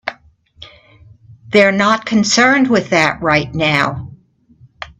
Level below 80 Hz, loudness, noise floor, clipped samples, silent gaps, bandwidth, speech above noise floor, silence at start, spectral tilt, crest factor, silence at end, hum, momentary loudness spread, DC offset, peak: -48 dBFS; -13 LUFS; -48 dBFS; under 0.1%; none; 10.5 kHz; 35 dB; 0.05 s; -4 dB/octave; 16 dB; 0.15 s; none; 10 LU; under 0.1%; 0 dBFS